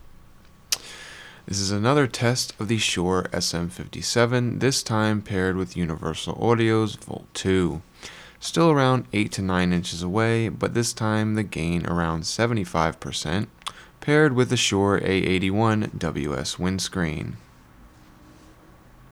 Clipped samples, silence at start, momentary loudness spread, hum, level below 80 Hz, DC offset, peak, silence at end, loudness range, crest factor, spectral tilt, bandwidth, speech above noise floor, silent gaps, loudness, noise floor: under 0.1%; 0.05 s; 13 LU; none; -48 dBFS; under 0.1%; -2 dBFS; 1.75 s; 3 LU; 22 dB; -5 dB/octave; 15.5 kHz; 27 dB; none; -23 LUFS; -50 dBFS